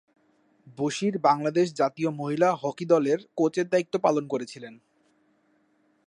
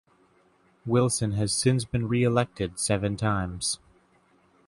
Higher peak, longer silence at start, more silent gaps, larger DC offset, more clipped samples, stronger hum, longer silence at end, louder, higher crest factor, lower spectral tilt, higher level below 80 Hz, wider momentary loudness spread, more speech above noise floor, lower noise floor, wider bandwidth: about the same, -8 dBFS vs -8 dBFS; second, 0.65 s vs 0.85 s; neither; neither; neither; neither; first, 1.35 s vs 0.9 s; about the same, -25 LUFS vs -26 LUFS; about the same, 18 dB vs 18 dB; about the same, -6 dB/octave vs -5 dB/octave; second, -76 dBFS vs -50 dBFS; first, 9 LU vs 6 LU; first, 42 dB vs 38 dB; first, -67 dBFS vs -63 dBFS; about the same, 11 kHz vs 11.5 kHz